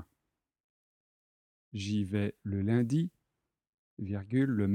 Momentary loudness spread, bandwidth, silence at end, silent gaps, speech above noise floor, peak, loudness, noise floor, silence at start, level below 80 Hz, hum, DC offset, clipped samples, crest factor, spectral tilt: 11 LU; 10 kHz; 0 s; 0.60-1.72 s, 3.69-3.97 s; 56 dB; -16 dBFS; -33 LUFS; -86 dBFS; 0 s; -72 dBFS; none; under 0.1%; under 0.1%; 18 dB; -7.5 dB/octave